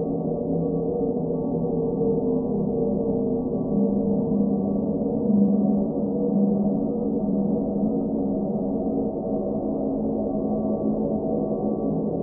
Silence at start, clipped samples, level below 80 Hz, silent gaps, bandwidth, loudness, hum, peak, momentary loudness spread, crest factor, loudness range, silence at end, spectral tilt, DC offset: 0 s; under 0.1%; -46 dBFS; none; 1.4 kHz; -24 LUFS; none; -8 dBFS; 4 LU; 16 dB; 3 LU; 0 s; -17 dB/octave; under 0.1%